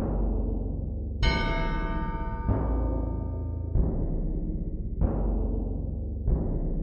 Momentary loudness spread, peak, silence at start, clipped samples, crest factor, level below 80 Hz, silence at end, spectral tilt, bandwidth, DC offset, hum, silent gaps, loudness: 6 LU; -10 dBFS; 0 s; under 0.1%; 16 dB; -30 dBFS; 0 s; -8 dB/octave; 7 kHz; under 0.1%; none; none; -31 LUFS